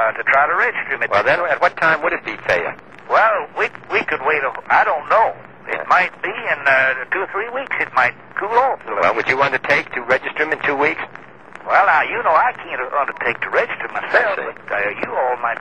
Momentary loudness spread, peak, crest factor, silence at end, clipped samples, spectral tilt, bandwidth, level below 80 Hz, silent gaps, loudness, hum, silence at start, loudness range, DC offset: 8 LU; -2 dBFS; 16 dB; 0 s; under 0.1%; -4.5 dB/octave; 9.4 kHz; -58 dBFS; none; -17 LUFS; none; 0 s; 1 LU; 0.4%